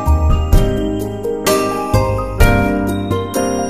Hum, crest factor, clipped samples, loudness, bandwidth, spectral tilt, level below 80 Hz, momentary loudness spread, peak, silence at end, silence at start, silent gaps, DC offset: none; 14 dB; under 0.1%; -16 LUFS; 15.5 kHz; -6 dB/octave; -18 dBFS; 5 LU; 0 dBFS; 0 s; 0 s; none; 0.9%